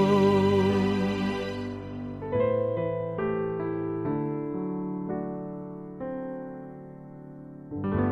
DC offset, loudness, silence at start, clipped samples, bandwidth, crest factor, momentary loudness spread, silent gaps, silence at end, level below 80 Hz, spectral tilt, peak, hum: under 0.1%; -29 LUFS; 0 s; under 0.1%; 12.5 kHz; 16 dB; 19 LU; none; 0 s; -54 dBFS; -8 dB/octave; -12 dBFS; none